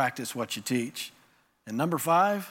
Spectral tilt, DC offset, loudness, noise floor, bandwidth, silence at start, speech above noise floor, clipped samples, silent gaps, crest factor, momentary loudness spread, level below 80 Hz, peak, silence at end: -4.5 dB/octave; under 0.1%; -28 LUFS; -64 dBFS; 17 kHz; 0 s; 36 dB; under 0.1%; none; 16 dB; 14 LU; -80 dBFS; -12 dBFS; 0 s